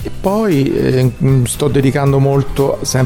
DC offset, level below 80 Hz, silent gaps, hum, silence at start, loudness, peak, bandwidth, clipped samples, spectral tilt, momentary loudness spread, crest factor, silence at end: under 0.1%; -32 dBFS; none; none; 0 s; -14 LUFS; -2 dBFS; 16.5 kHz; under 0.1%; -6.5 dB/octave; 3 LU; 12 dB; 0 s